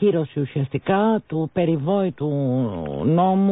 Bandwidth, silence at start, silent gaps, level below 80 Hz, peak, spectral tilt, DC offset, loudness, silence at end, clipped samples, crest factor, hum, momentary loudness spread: 4 kHz; 0 s; none; -52 dBFS; -8 dBFS; -13 dB/octave; under 0.1%; -22 LUFS; 0 s; under 0.1%; 14 dB; none; 6 LU